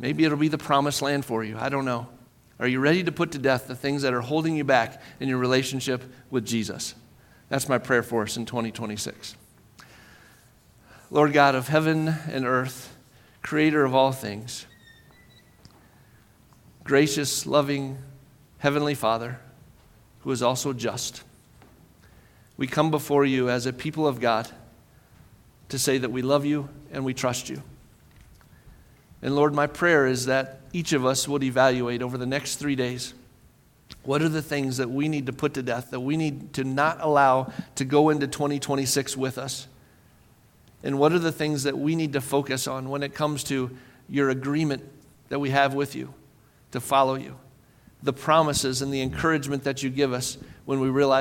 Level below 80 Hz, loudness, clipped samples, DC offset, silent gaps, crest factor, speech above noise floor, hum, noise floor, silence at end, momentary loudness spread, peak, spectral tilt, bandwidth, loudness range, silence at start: -58 dBFS; -25 LUFS; under 0.1%; under 0.1%; none; 22 dB; 32 dB; none; -57 dBFS; 0 s; 12 LU; -2 dBFS; -4.5 dB/octave; 17 kHz; 5 LU; 0 s